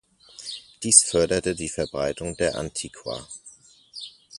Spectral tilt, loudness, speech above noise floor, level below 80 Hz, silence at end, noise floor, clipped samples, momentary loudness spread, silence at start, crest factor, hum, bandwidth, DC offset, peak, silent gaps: -2.5 dB/octave; -22 LUFS; 27 dB; -50 dBFS; 0 s; -51 dBFS; under 0.1%; 23 LU; 0.4 s; 26 dB; none; 11.5 kHz; under 0.1%; 0 dBFS; none